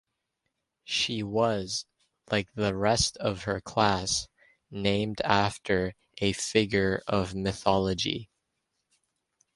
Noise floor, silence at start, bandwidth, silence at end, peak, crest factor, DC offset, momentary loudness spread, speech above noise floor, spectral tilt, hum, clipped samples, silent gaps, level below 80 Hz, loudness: -82 dBFS; 0.85 s; 11.5 kHz; 1.3 s; -6 dBFS; 24 dB; under 0.1%; 6 LU; 54 dB; -4 dB/octave; none; under 0.1%; none; -50 dBFS; -28 LUFS